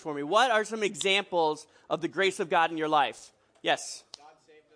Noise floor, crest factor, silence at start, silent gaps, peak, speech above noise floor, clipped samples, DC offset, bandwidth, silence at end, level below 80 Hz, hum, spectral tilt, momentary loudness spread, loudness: -57 dBFS; 20 dB; 0.05 s; none; -10 dBFS; 29 dB; under 0.1%; under 0.1%; 10.5 kHz; 0.45 s; -80 dBFS; none; -2.5 dB/octave; 11 LU; -27 LUFS